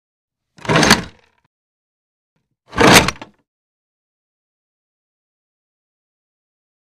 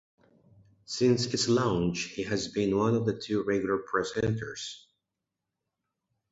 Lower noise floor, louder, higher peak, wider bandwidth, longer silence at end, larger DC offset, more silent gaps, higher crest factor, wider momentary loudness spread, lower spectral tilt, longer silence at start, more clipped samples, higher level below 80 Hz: second, -32 dBFS vs -86 dBFS; first, -12 LUFS vs -29 LUFS; first, 0 dBFS vs -12 dBFS; first, 15.5 kHz vs 8 kHz; first, 3.8 s vs 1.55 s; neither; first, 1.46-2.36 s vs none; about the same, 20 dB vs 18 dB; first, 18 LU vs 11 LU; second, -3 dB/octave vs -5 dB/octave; second, 0.65 s vs 0.9 s; neither; first, -42 dBFS vs -58 dBFS